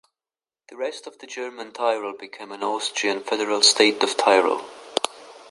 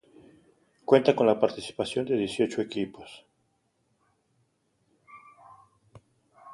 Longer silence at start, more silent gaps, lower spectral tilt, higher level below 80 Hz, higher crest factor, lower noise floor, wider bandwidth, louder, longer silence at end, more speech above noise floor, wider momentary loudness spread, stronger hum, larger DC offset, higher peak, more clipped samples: second, 0.7 s vs 0.9 s; neither; second, -0.5 dB/octave vs -5.5 dB/octave; second, -76 dBFS vs -68 dBFS; about the same, 22 dB vs 24 dB; first, under -90 dBFS vs -73 dBFS; about the same, 11.5 kHz vs 11.5 kHz; first, -21 LUFS vs -26 LUFS; about the same, 0.1 s vs 0 s; first, over 67 dB vs 47 dB; about the same, 17 LU vs 17 LU; neither; neither; first, -2 dBFS vs -6 dBFS; neither